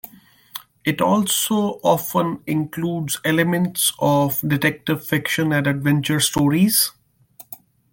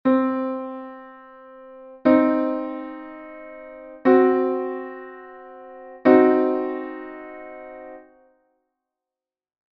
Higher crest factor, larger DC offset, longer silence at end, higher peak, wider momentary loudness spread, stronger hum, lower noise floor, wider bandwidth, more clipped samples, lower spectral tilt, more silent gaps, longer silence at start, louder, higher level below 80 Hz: second, 16 dB vs 22 dB; neither; second, 0.4 s vs 1.75 s; about the same, -4 dBFS vs -2 dBFS; second, 17 LU vs 25 LU; neither; second, -48 dBFS vs -90 dBFS; first, 17 kHz vs 5.2 kHz; neither; about the same, -4 dB/octave vs -5 dB/octave; neither; first, 0.55 s vs 0.05 s; about the same, -19 LUFS vs -20 LUFS; first, -56 dBFS vs -66 dBFS